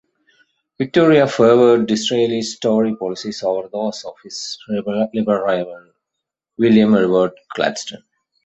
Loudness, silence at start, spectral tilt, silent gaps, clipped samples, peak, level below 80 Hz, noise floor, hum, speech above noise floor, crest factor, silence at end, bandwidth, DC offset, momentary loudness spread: -17 LUFS; 0.8 s; -5.5 dB/octave; none; under 0.1%; -2 dBFS; -60 dBFS; -81 dBFS; none; 64 dB; 16 dB; 0.5 s; 8.2 kHz; under 0.1%; 15 LU